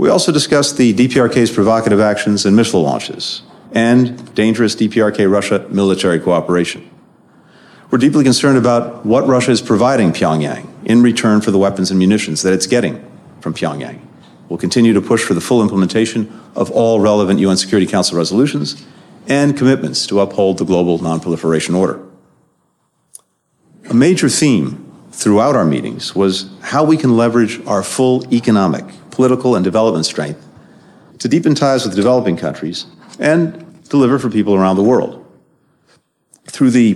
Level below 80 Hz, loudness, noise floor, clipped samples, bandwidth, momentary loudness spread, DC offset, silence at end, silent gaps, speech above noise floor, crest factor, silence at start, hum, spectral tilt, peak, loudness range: -54 dBFS; -13 LUFS; -62 dBFS; under 0.1%; 13 kHz; 11 LU; under 0.1%; 0 s; none; 49 dB; 12 dB; 0 s; none; -5.5 dB/octave; -2 dBFS; 4 LU